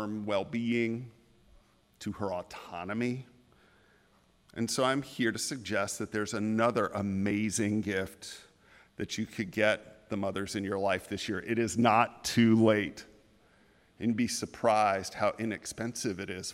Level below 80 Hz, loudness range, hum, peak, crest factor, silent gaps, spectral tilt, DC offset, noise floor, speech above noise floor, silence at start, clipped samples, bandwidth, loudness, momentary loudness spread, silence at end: -66 dBFS; 7 LU; none; -10 dBFS; 22 dB; none; -4.5 dB/octave; under 0.1%; -66 dBFS; 35 dB; 0 s; under 0.1%; 16 kHz; -31 LUFS; 14 LU; 0 s